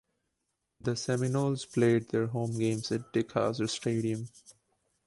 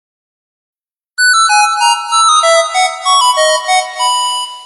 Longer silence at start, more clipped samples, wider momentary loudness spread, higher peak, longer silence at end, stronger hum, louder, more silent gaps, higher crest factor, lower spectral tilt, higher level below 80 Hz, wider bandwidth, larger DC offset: second, 0.85 s vs 1.2 s; neither; about the same, 8 LU vs 6 LU; second, -14 dBFS vs 0 dBFS; first, 0.55 s vs 0 s; neither; second, -31 LUFS vs -10 LUFS; neither; first, 18 dB vs 12 dB; first, -6 dB/octave vs 5.5 dB/octave; about the same, -66 dBFS vs -70 dBFS; about the same, 11.5 kHz vs 12.5 kHz; second, under 0.1% vs 0.3%